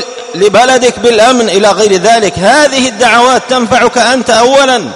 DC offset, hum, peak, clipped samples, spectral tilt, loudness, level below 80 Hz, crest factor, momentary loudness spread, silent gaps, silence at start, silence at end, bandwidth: 0.2%; none; 0 dBFS; 1%; -3 dB/octave; -7 LUFS; -42 dBFS; 8 dB; 3 LU; none; 0 s; 0 s; 12.5 kHz